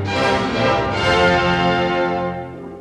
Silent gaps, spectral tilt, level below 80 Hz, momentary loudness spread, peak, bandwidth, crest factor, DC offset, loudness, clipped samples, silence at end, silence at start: none; -5.5 dB/octave; -38 dBFS; 10 LU; -4 dBFS; 11.5 kHz; 14 dB; under 0.1%; -17 LUFS; under 0.1%; 0 s; 0 s